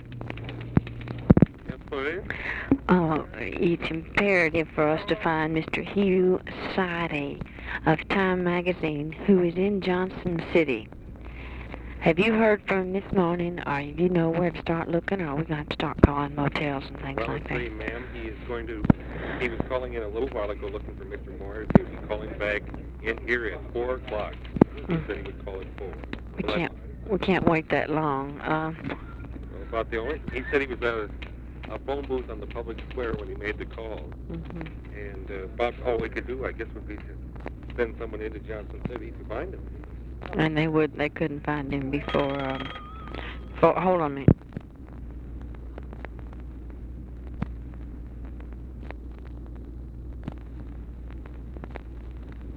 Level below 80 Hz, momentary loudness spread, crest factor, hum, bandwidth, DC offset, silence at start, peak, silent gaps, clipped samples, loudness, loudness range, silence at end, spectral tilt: -40 dBFS; 18 LU; 28 dB; none; 8.4 kHz; under 0.1%; 0 s; 0 dBFS; none; under 0.1%; -27 LUFS; 15 LU; 0 s; -8.5 dB/octave